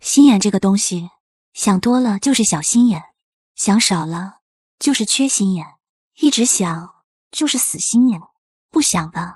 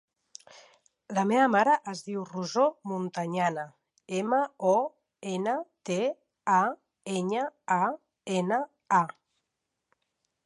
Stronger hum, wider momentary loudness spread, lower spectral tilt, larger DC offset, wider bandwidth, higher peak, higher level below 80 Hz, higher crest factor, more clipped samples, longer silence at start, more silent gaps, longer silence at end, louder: neither; about the same, 14 LU vs 12 LU; second, -3.5 dB/octave vs -5.5 dB/octave; neither; first, 13 kHz vs 11.5 kHz; first, -2 dBFS vs -10 dBFS; first, -56 dBFS vs -82 dBFS; about the same, 16 dB vs 18 dB; neither; second, 0.05 s vs 0.55 s; first, 1.20-1.52 s, 3.23-3.55 s, 4.42-4.78 s, 5.89-6.11 s, 7.04-7.31 s, 8.38-8.69 s vs none; second, 0.05 s vs 1.35 s; first, -16 LUFS vs -29 LUFS